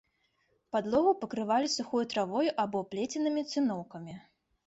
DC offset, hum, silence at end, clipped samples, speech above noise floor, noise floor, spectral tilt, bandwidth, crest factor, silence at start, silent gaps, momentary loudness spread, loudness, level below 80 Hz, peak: under 0.1%; none; 0.5 s; under 0.1%; 43 dB; -74 dBFS; -4.5 dB/octave; 8.2 kHz; 18 dB; 0.75 s; none; 14 LU; -31 LUFS; -70 dBFS; -14 dBFS